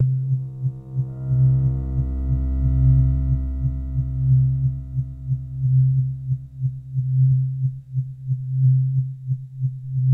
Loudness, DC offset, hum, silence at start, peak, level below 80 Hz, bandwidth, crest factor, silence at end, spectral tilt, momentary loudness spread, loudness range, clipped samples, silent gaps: -22 LUFS; under 0.1%; none; 0 s; -8 dBFS; -30 dBFS; 1.4 kHz; 12 dB; 0 s; -13 dB/octave; 10 LU; 1 LU; under 0.1%; none